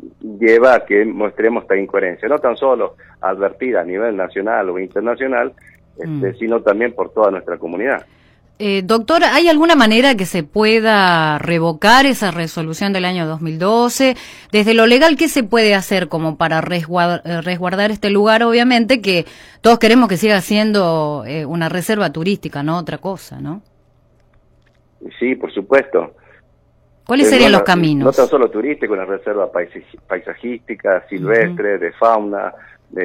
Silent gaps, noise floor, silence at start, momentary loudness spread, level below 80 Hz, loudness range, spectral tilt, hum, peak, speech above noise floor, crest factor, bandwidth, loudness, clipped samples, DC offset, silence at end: none; -53 dBFS; 0 s; 13 LU; -48 dBFS; 9 LU; -5 dB/octave; none; 0 dBFS; 39 dB; 16 dB; 16.5 kHz; -15 LUFS; under 0.1%; under 0.1%; 0 s